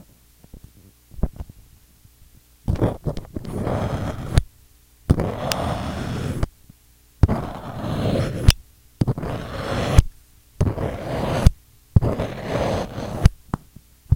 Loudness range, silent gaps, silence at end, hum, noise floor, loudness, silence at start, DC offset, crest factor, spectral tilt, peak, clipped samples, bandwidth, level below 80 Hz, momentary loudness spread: 6 LU; none; 0 s; none; -54 dBFS; -24 LUFS; 0.55 s; under 0.1%; 22 dB; -6.5 dB/octave; 0 dBFS; under 0.1%; 17 kHz; -28 dBFS; 12 LU